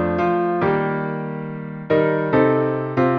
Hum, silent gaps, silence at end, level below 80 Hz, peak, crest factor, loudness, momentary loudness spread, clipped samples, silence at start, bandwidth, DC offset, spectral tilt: none; none; 0 s; -52 dBFS; -6 dBFS; 14 dB; -20 LUFS; 11 LU; under 0.1%; 0 s; 6.2 kHz; under 0.1%; -9.5 dB/octave